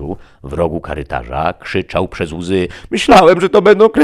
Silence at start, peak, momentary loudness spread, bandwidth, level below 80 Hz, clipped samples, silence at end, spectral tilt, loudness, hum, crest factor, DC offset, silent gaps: 0 s; 0 dBFS; 15 LU; 13 kHz; -34 dBFS; under 0.1%; 0 s; -5.5 dB/octave; -13 LUFS; none; 12 dB; under 0.1%; none